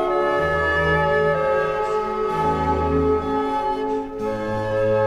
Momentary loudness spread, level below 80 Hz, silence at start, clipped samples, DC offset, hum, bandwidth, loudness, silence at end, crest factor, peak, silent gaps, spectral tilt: 6 LU; -38 dBFS; 0 s; under 0.1%; under 0.1%; none; 12 kHz; -21 LUFS; 0 s; 14 dB; -8 dBFS; none; -7 dB/octave